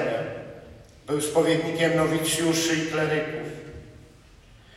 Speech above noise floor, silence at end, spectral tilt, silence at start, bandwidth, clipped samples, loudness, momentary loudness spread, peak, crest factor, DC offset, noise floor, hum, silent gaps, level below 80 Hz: 27 dB; 0.8 s; -4 dB/octave; 0 s; 16 kHz; under 0.1%; -24 LUFS; 20 LU; -10 dBFS; 16 dB; under 0.1%; -51 dBFS; none; none; -54 dBFS